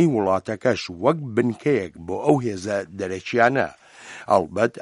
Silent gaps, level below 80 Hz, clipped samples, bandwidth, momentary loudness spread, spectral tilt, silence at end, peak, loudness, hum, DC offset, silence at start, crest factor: none; -60 dBFS; under 0.1%; 11.5 kHz; 10 LU; -6.5 dB/octave; 0 s; -2 dBFS; -22 LUFS; none; under 0.1%; 0 s; 20 dB